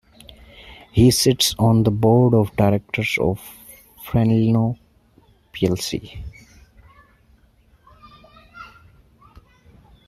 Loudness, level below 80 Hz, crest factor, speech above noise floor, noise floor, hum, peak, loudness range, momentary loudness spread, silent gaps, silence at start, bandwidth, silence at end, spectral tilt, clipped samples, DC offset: -18 LUFS; -44 dBFS; 18 dB; 38 dB; -56 dBFS; none; -2 dBFS; 12 LU; 24 LU; none; 0.65 s; 15.5 kHz; 1.4 s; -5.5 dB/octave; under 0.1%; under 0.1%